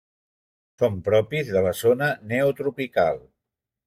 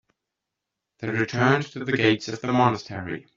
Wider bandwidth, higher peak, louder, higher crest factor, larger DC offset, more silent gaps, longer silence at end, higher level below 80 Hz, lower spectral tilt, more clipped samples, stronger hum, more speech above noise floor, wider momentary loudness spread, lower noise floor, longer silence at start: first, 16 kHz vs 7.6 kHz; second, -8 dBFS vs -4 dBFS; about the same, -23 LUFS vs -24 LUFS; about the same, 18 dB vs 22 dB; neither; neither; first, 0.65 s vs 0.15 s; about the same, -60 dBFS vs -62 dBFS; first, -6 dB/octave vs -4.5 dB/octave; neither; neither; about the same, 63 dB vs 61 dB; second, 4 LU vs 11 LU; about the same, -85 dBFS vs -84 dBFS; second, 0.8 s vs 1 s